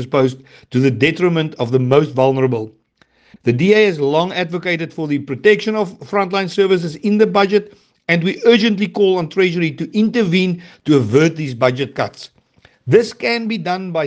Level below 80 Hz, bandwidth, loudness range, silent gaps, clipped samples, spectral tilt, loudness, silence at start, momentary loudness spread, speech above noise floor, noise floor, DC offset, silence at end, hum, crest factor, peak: -60 dBFS; 8.8 kHz; 2 LU; none; under 0.1%; -6.5 dB/octave; -16 LUFS; 0 s; 8 LU; 40 dB; -56 dBFS; under 0.1%; 0 s; none; 16 dB; 0 dBFS